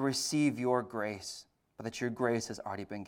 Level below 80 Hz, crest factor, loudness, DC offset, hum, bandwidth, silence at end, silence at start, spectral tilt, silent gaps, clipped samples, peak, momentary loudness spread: -72 dBFS; 18 dB; -34 LUFS; under 0.1%; none; 17.5 kHz; 0 s; 0 s; -4.5 dB/octave; none; under 0.1%; -16 dBFS; 13 LU